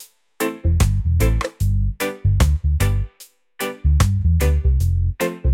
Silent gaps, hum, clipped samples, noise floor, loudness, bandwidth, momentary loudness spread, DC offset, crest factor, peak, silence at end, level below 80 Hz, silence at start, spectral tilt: none; none; under 0.1%; -48 dBFS; -20 LUFS; 17 kHz; 8 LU; under 0.1%; 12 dB; -6 dBFS; 0 s; -22 dBFS; 0 s; -6 dB/octave